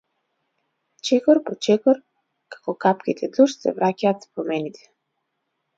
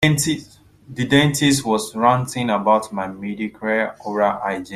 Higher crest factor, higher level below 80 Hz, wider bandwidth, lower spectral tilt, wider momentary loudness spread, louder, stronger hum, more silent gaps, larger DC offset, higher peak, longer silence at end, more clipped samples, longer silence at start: about the same, 18 dB vs 18 dB; second, -72 dBFS vs -52 dBFS; second, 7.8 kHz vs 15 kHz; about the same, -5.5 dB/octave vs -4.5 dB/octave; about the same, 11 LU vs 11 LU; about the same, -21 LUFS vs -19 LUFS; second, none vs 50 Hz at -50 dBFS; neither; neither; about the same, -4 dBFS vs -2 dBFS; first, 1.05 s vs 0 s; neither; first, 1.05 s vs 0 s